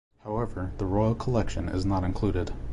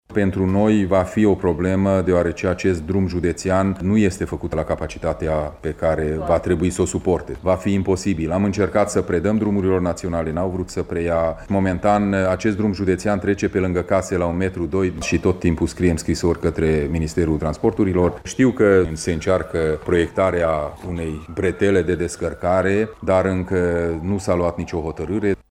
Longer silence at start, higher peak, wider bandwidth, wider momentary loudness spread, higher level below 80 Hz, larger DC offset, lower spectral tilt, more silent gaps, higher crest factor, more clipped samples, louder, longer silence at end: first, 0.25 s vs 0.1 s; second, -12 dBFS vs -4 dBFS; second, 10.5 kHz vs 13 kHz; about the same, 7 LU vs 6 LU; about the same, -36 dBFS vs -38 dBFS; neither; first, -8 dB/octave vs -6.5 dB/octave; neither; about the same, 16 dB vs 16 dB; neither; second, -29 LUFS vs -20 LUFS; second, 0 s vs 0.15 s